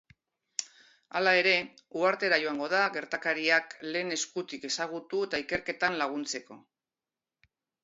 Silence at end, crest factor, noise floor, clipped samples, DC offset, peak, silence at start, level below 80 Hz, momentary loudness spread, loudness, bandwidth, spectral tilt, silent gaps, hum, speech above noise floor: 1.25 s; 22 dB; under -90 dBFS; under 0.1%; under 0.1%; -10 dBFS; 0.6 s; -72 dBFS; 12 LU; -29 LUFS; 8 kHz; -2 dB/octave; none; none; over 60 dB